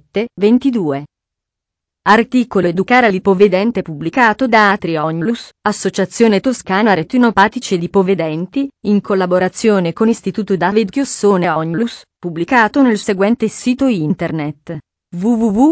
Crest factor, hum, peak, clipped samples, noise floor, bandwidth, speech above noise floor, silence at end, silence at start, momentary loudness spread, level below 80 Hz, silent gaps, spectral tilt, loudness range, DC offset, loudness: 14 dB; none; 0 dBFS; under 0.1%; -82 dBFS; 8 kHz; 68 dB; 0 s; 0.15 s; 9 LU; -50 dBFS; none; -6 dB/octave; 3 LU; under 0.1%; -14 LUFS